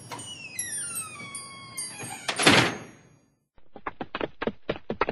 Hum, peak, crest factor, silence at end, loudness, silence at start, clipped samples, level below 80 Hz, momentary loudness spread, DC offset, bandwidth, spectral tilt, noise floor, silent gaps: none; -4 dBFS; 26 dB; 0 s; -27 LUFS; 0 s; under 0.1%; -58 dBFS; 19 LU; under 0.1%; 12.5 kHz; -2.5 dB/octave; -63 dBFS; none